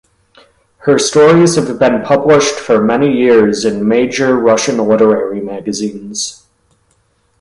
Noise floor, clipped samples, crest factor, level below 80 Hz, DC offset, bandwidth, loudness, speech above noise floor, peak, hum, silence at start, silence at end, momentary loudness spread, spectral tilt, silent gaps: -57 dBFS; under 0.1%; 12 dB; -50 dBFS; under 0.1%; 11.5 kHz; -11 LUFS; 46 dB; 0 dBFS; none; 0.85 s; 1.05 s; 12 LU; -4.5 dB/octave; none